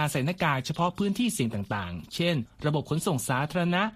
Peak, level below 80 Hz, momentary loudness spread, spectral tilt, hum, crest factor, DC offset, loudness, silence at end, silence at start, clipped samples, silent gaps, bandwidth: -12 dBFS; -56 dBFS; 5 LU; -5 dB/octave; none; 16 dB; under 0.1%; -28 LUFS; 0 s; 0 s; under 0.1%; none; 15 kHz